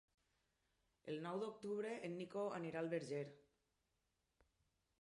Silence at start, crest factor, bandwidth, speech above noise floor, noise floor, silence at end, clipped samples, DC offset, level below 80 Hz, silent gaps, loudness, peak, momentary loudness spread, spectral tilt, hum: 1.05 s; 18 dB; 11 kHz; 41 dB; -87 dBFS; 1.6 s; under 0.1%; under 0.1%; -88 dBFS; none; -47 LUFS; -32 dBFS; 6 LU; -6.5 dB/octave; none